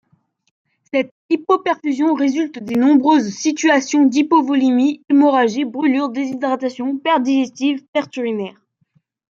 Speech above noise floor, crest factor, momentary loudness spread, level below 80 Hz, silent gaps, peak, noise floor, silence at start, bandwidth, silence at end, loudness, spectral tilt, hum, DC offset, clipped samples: 46 dB; 14 dB; 9 LU; -70 dBFS; 1.11-1.29 s, 7.88-7.93 s; -2 dBFS; -62 dBFS; 0.95 s; 7.6 kHz; 0.8 s; -17 LUFS; -4 dB/octave; none; under 0.1%; under 0.1%